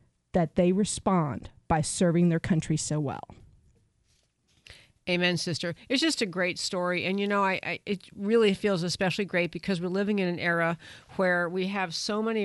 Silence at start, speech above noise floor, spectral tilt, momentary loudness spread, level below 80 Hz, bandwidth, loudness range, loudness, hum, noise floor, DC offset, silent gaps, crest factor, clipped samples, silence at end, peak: 0.35 s; 42 dB; -5 dB/octave; 8 LU; -56 dBFS; 11.5 kHz; 4 LU; -27 LUFS; none; -69 dBFS; under 0.1%; none; 20 dB; under 0.1%; 0 s; -8 dBFS